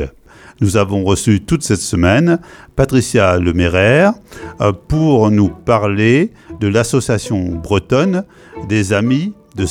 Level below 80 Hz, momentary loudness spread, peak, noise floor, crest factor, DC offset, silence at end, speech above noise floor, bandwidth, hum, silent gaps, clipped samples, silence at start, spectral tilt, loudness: -34 dBFS; 10 LU; 0 dBFS; -40 dBFS; 14 dB; under 0.1%; 0 s; 26 dB; 16 kHz; none; none; under 0.1%; 0 s; -6 dB/octave; -14 LUFS